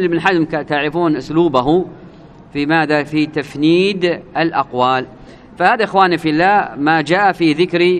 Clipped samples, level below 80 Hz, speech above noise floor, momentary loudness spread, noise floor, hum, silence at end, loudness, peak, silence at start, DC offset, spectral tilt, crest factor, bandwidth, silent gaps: under 0.1%; -48 dBFS; 24 dB; 5 LU; -38 dBFS; none; 0 s; -15 LUFS; 0 dBFS; 0 s; under 0.1%; -6.5 dB/octave; 14 dB; 9.8 kHz; none